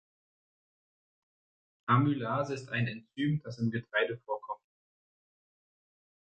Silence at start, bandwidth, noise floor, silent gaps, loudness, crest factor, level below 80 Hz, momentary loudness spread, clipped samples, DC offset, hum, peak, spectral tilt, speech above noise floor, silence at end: 1.85 s; 8.6 kHz; under -90 dBFS; none; -32 LUFS; 22 dB; -70 dBFS; 11 LU; under 0.1%; under 0.1%; none; -12 dBFS; -7.5 dB/octave; over 59 dB; 1.75 s